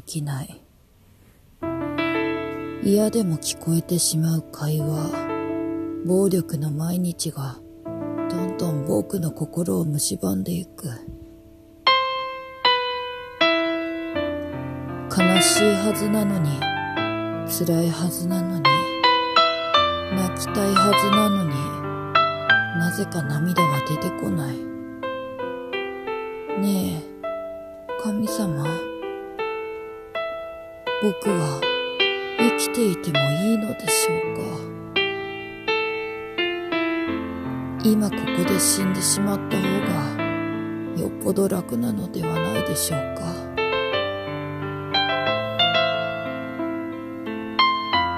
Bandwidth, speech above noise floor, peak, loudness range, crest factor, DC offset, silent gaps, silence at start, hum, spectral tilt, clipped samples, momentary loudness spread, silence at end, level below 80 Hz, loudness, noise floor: 14.5 kHz; 32 dB; -2 dBFS; 7 LU; 20 dB; under 0.1%; none; 0.05 s; none; -4 dB/octave; under 0.1%; 12 LU; 0 s; -54 dBFS; -23 LUFS; -54 dBFS